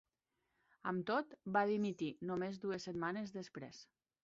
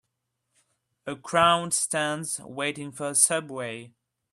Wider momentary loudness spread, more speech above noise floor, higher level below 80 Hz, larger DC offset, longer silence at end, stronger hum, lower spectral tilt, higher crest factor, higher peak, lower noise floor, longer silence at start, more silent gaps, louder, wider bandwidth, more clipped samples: second, 14 LU vs 17 LU; second, 47 dB vs 54 dB; second, -80 dBFS vs -68 dBFS; neither; about the same, 0.4 s vs 0.45 s; neither; first, -5 dB/octave vs -2 dB/octave; about the same, 20 dB vs 22 dB; second, -20 dBFS vs -6 dBFS; first, -87 dBFS vs -80 dBFS; second, 0.85 s vs 1.05 s; neither; second, -41 LUFS vs -25 LUFS; second, 7.6 kHz vs 14 kHz; neither